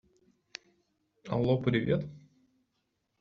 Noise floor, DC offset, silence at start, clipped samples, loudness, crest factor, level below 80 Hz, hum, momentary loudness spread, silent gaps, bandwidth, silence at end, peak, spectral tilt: -80 dBFS; under 0.1%; 1.25 s; under 0.1%; -30 LUFS; 20 dB; -60 dBFS; none; 20 LU; none; 7.4 kHz; 1 s; -14 dBFS; -6.5 dB/octave